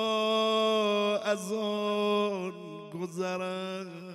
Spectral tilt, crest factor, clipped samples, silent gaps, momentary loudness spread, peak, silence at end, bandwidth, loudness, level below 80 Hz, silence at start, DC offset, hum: -4.5 dB/octave; 14 dB; under 0.1%; none; 13 LU; -16 dBFS; 0 s; 14 kHz; -30 LUFS; -86 dBFS; 0 s; under 0.1%; none